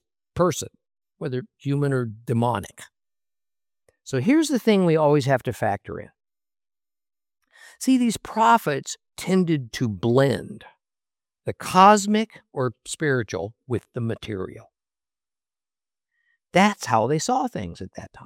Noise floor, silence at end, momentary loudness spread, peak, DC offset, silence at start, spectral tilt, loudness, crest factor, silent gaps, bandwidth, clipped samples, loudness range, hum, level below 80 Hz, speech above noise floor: under -90 dBFS; 0 s; 16 LU; -2 dBFS; under 0.1%; 0.35 s; -5.5 dB/octave; -22 LUFS; 22 dB; none; 16.5 kHz; under 0.1%; 7 LU; none; -60 dBFS; over 68 dB